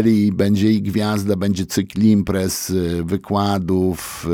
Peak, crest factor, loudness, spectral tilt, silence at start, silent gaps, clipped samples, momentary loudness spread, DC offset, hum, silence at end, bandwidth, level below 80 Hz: -4 dBFS; 14 dB; -19 LUFS; -6 dB/octave; 0 s; none; under 0.1%; 6 LU; under 0.1%; none; 0 s; 17.5 kHz; -44 dBFS